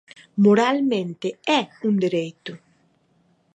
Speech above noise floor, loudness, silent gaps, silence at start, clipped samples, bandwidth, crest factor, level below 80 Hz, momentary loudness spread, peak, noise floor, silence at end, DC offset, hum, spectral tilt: 42 dB; -21 LUFS; none; 0.35 s; under 0.1%; 8.4 kHz; 18 dB; -74 dBFS; 16 LU; -6 dBFS; -63 dBFS; 1 s; under 0.1%; none; -6 dB/octave